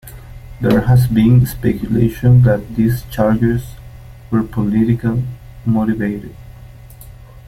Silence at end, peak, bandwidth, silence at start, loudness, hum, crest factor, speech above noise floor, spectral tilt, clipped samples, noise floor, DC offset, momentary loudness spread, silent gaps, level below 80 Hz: 0 s; 0 dBFS; 15 kHz; 0.05 s; -15 LUFS; none; 14 dB; 23 dB; -8.5 dB/octave; under 0.1%; -37 dBFS; under 0.1%; 12 LU; none; -34 dBFS